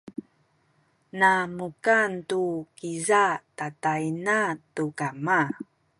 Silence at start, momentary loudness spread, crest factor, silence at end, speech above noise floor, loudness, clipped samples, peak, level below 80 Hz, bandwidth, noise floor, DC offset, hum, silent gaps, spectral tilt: 0.05 s; 14 LU; 18 dB; 0.35 s; 41 dB; -25 LUFS; under 0.1%; -8 dBFS; -72 dBFS; 11.5 kHz; -67 dBFS; under 0.1%; none; none; -4.5 dB/octave